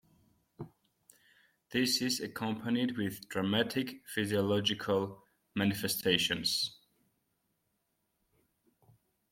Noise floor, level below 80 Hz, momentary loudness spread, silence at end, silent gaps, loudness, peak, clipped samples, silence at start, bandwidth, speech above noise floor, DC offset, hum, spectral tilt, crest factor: -80 dBFS; -72 dBFS; 10 LU; 2.55 s; none; -32 LUFS; -12 dBFS; under 0.1%; 0.6 s; 16.5 kHz; 48 dB; under 0.1%; none; -4 dB/octave; 24 dB